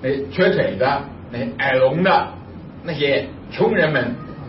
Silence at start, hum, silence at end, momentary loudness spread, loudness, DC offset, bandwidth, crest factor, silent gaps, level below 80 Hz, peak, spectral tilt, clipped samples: 0 s; none; 0 s; 15 LU; -19 LUFS; under 0.1%; 5.8 kHz; 14 dB; none; -48 dBFS; -4 dBFS; -10.5 dB/octave; under 0.1%